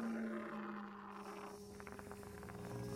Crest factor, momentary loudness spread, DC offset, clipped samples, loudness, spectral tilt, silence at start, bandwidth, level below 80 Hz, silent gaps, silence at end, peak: 16 dB; 8 LU; under 0.1%; under 0.1%; -49 LUFS; -6 dB/octave; 0 s; 16.5 kHz; -68 dBFS; none; 0 s; -32 dBFS